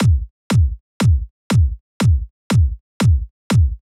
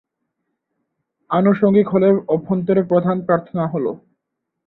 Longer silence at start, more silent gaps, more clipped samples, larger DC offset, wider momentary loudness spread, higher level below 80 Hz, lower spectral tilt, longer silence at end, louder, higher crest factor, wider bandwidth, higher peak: second, 0 s vs 1.3 s; first, 0.30-0.50 s, 0.80-1.00 s, 1.30-1.50 s, 1.80-2.00 s, 2.30-2.50 s, 2.80-3.00 s, 3.30-3.50 s vs none; neither; neither; second, 5 LU vs 8 LU; first, -22 dBFS vs -60 dBFS; second, -6.5 dB/octave vs -12 dB/octave; second, 0.25 s vs 0.7 s; about the same, -19 LUFS vs -17 LUFS; second, 10 dB vs 16 dB; first, 13 kHz vs 4.1 kHz; about the same, -6 dBFS vs -4 dBFS